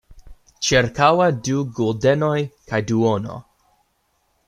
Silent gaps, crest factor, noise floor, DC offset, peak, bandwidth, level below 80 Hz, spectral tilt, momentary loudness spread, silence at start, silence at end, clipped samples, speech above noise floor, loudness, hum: none; 20 dB; -67 dBFS; under 0.1%; -2 dBFS; 13 kHz; -48 dBFS; -5 dB/octave; 10 LU; 0.1 s; 1.05 s; under 0.1%; 48 dB; -19 LUFS; none